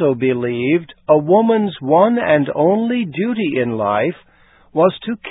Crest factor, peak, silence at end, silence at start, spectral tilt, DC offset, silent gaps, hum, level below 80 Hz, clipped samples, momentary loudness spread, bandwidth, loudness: 16 dB; 0 dBFS; 0 s; 0 s; -12 dB/octave; under 0.1%; none; none; -56 dBFS; under 0.1%; 6 LU; 4 kHz; -16 LUFS